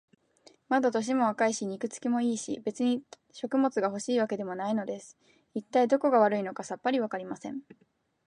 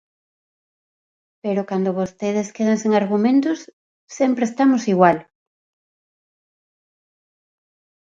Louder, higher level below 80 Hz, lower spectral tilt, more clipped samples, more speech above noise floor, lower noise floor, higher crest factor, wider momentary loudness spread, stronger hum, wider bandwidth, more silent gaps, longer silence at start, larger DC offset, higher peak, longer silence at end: second, -29 LUFS vs -19 LUFS; second, -80 dBFS vs -68 dBFS; second, -4.5 dB/octave vs -6.5 dB/octave; neither; second, 33 dB vs over 72 dB; second, -61 dBFS vs under -90 dBFS; about the same, 20 dB vs 20 dB; first, 14 LU vs 9 LU; neither; first, 10.5 kHz vs 7.8 kHz; second, none vs 3.73-4.07 s; second, 0.7 s vs 1.45 s; neither; second, -10 dBFS vs -2 dBFS; second, 0.65 s vs 2.8 s